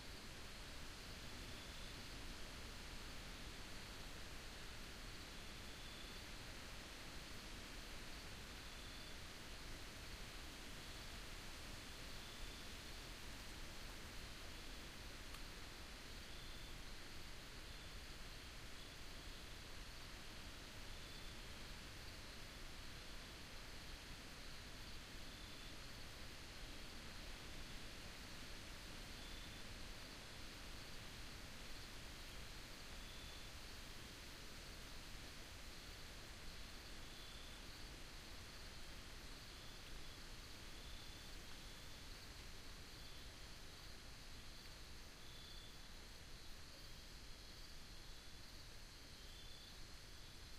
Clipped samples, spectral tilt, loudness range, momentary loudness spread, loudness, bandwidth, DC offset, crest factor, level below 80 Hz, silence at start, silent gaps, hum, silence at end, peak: under 0.1%; -3 dB/octave; 3 LU; 4 LU; -55 LUFS; 15.5 kHz; under 0.1%; 14 dB; -58 dBFS; 0 s; none; none; 0 s; -38 dBFS